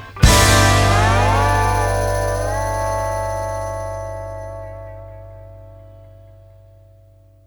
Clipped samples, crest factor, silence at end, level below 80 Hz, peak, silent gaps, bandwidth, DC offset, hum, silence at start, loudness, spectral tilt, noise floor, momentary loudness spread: under 0.1%; 18 dB; 1.4 s; -26 dBFS; 0 dBFS; none; 19.5 kHz; under 0.1%; 60 Hz at -55 dBFS; 0 s; -17 LUFS; -4 dB/octave; -48 dBFS; 23 LU